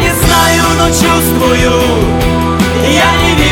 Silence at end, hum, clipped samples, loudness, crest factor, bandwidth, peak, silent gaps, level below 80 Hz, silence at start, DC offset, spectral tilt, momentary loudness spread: 0 s; none; under 0.1%; -9 LUFS; 8 dB; 18.5 kHz; 0 dBFS; none; -20 dBFS; 0 s; under 0.1%; -4 dB/octave; 4 LU